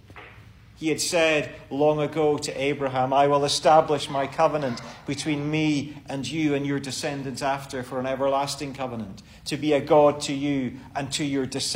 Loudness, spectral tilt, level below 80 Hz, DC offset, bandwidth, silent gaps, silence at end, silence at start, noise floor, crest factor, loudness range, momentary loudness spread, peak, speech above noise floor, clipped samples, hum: -24 LUFS; -4.5 dB/octave; -56 dBFS; under 0.1%; 16 kHz; none; 0 s; 0.1 s; -48 dBFS; 18 dB; 5 LU; 13 LU; -6 dBFS; 24 dB; under 0.1%; none